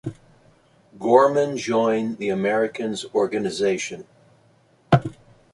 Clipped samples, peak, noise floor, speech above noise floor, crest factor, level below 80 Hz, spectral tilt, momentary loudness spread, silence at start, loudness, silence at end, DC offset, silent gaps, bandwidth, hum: under 0.1%; -2 dBFS; -58 dBFS; 37 dB; 20 dB; -56 dBFS; -6 dB/octave; 13 LU; 0.05 s; -22 LUFS; 0.4 s; under 0.1%; none; 11.5 kHz; none